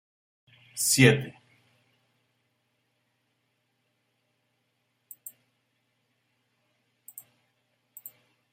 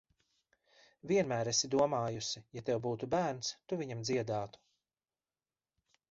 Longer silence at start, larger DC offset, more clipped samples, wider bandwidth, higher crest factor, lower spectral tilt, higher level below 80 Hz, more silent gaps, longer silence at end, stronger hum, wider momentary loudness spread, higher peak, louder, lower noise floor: second, 0.75 s vs 1.05 s; neither; neither; first, 16 kHz vs 7.6 kHz; first, 30 dB vs 20 dB; about the same, -4 dB/octave vs -4.5 dB/octave; about the same, -68 dBFS vs -70 dBFS; neither; first, 7.25 s vs 1.6 s; neither; first, 28 LU vs 9 LU; first, -4 dBFS vs -18 dBFS; first, -22 LUFS vs -35 LUFS; second, -76 dBFS vs under -90 dBFS